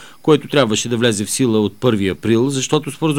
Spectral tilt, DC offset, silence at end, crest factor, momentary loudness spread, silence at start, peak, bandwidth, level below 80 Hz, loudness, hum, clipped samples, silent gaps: -4.5 dB/octave; 0.7%; 0 s; 16 dB; 3 LU; 0 s; 0 dBFS; 19.5 kHz; -54 dBFS; -16 LUFS; none; under 0.1%; none